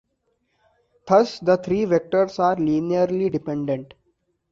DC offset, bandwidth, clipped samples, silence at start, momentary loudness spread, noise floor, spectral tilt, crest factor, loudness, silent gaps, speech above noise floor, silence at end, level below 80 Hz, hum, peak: under 0.1%; 7.6 kHz; under 0.1%; 1.05 s; 8 LU; -71 dBFS; -7 dB/octave; 18 dB; -21 LUFS; none; 51 dB; 0.65 s; -60 dBFS; none; -4 dBFS